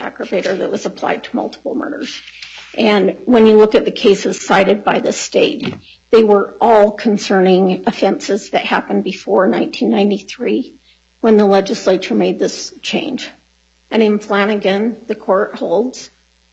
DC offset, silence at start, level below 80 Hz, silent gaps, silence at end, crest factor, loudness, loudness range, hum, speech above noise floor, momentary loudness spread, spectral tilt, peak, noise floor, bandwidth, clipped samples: under 0.1%; 0 s; -54 dBFS; none; 0.45 s; 14 dB; -13 LUFS; 5 LU; none; 41 dB; 13 LU; -5 dB/octave; 0 dBFS; -55 dBFS; 8.2 kHz; under 0.1%